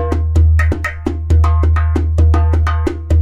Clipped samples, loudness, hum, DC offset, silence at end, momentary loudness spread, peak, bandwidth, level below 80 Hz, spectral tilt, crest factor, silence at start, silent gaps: under 0.1%; -14 LUFS; none; under 0.1%; 0 s; 7 LU; -2 dBFS; 7.4 kHz; -14 dBFS; -8 dB/octave; 10 dB; 0 s; none